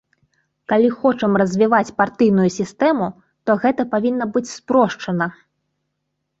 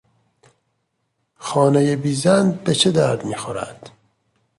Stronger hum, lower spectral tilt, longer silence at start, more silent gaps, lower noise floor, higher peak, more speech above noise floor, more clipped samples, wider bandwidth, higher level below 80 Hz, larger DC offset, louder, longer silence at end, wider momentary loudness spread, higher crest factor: neither; first, -6.5 dB/octave vs -5 dB/octave; second, 0.7 s vs 1.4 s; neither; about the same, -75 dBFS vs -72 dBFS; about the same, -2 dBFS vs -2 dBFS; first, 58 dB vs 54 dB; neither; second, 8 kHz vs 11.5 kHz; about the same, -58 dBFS vs -58 dBFS; neither; about the same, -18 LUFS vs -18 LUFS; first, 1.1 s vs 0.7 s; second, 8 LU vs 13 LU; about the same, 18 dB vs 18 dB